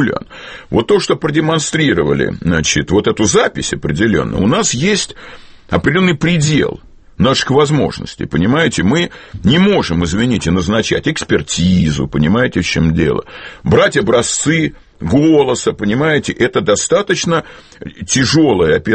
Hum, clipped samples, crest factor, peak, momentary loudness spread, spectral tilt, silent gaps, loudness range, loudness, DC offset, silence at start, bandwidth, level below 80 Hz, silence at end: none; under 0.1%; 14 dB; 0 dBFS; 8 LU; -4.5 dB/octave; none; 1 LU; -13 LUFS; under 0.1%; 0 s; 8.8 kHz; -34 dBFS; 0 s